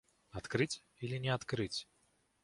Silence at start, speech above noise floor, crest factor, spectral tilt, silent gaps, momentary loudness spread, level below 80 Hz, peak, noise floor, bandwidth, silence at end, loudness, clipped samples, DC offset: 0.35 s; 37 dB; 22 dB; -5 dB/octave; none; 13 LU; -64 dBFS; -18 dBFS; -75 dBFS; 11.5 kHz; 0.6 s; -39 LUFS; under 0.1%; under 0.1%